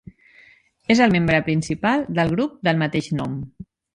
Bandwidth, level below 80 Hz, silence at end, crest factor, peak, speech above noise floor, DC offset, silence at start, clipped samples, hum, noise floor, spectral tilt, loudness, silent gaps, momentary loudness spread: 11 kHz; -48 dBFS; 0.35 s; 18 dB; -2 dBFS; 33 dB; under 0.1%; 0.9 s; under 0.1%; none; -53 dBFS; -6 dB/octave; -20 LUFS; none; 13 LU